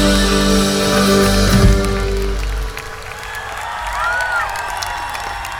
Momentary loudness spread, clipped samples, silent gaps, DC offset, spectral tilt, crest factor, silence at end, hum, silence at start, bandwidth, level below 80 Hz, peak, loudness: 13 LU; under 0.1%; none; under 0.1%; -4.5 dB/octave; 14 dB; 0 s; none; 0 s; 17 kHz; -22 dBFS; -2 dBFS; -16 LUFS